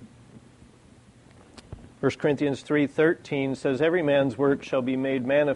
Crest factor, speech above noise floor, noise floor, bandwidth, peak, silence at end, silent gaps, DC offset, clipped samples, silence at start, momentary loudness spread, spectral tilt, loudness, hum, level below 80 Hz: 16 dB; 29 dB; -53 dBFS; 11 kHz; -10 dBFS; 0 s; none; under 0.1%; under 0.1%; 0 s; 6 LU; -7 dB/octave; -25 LUFS; none; -60 dBFS